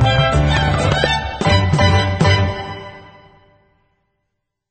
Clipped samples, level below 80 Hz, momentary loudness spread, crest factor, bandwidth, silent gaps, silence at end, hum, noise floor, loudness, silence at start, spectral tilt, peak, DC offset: under 0.1%; -28 dBFS; 14 LU; 16 dB; 9 kHz; none; 1.7 s; none; -75 dBFS; -15 LUFS; 0 s; -5.5 dB/octave; 0 dBFS; under 0.1%